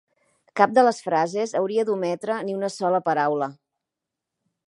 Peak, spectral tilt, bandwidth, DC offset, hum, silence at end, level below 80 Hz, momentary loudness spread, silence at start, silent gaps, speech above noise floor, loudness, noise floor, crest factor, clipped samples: -2 dBFS; -5 dB/octave; 11.5 kHz; under 0.1%; none; 1.15 s; -80 dBFS; 9 LU; 0.55 s; none; 63 dB; -23 LUFS; -85 dBFS; 22 dB; under 0.1%